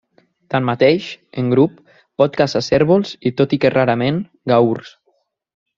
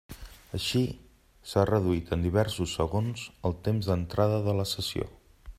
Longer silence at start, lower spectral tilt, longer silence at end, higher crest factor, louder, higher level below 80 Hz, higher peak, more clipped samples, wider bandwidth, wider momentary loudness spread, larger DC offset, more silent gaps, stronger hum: first, 0.5 s vs 0.1 s; about the same, -7 dB/octave vs -6 dB/octave; first, 0.9 s vs 0.05 s; about the same, 16 dB vs 20 dB; first, -17 LUFS vs -29 LUFS; second, -54 dBFS vs -48 dBFS; first, 0 dBFS vs -10 dBFS; neither; second, 7.4 kHz vs 15.5 kHz; second, 8 LU vs 13 LU; neither; neither; neither